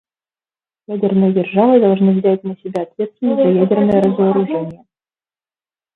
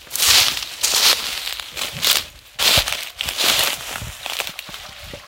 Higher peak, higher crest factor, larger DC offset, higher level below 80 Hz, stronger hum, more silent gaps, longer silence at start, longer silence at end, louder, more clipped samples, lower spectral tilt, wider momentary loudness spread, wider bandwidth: about the same, 0 dBFS vs 0 dBFS; about the same, 16 dB vs 20 dB; neither; second, -58 dBFS vs -44 dBFS; neither; neither; first, 0.9 s vs 0 s; first, 1.2 s vs 0 s; about the same, -15 LUFS vs -17 LUFS; neither; first, -10 dB/octave vs 0.5 dB/octave; second, 12 LU vs 16 LU; second, 4.1 kHz vs 17.5 kHz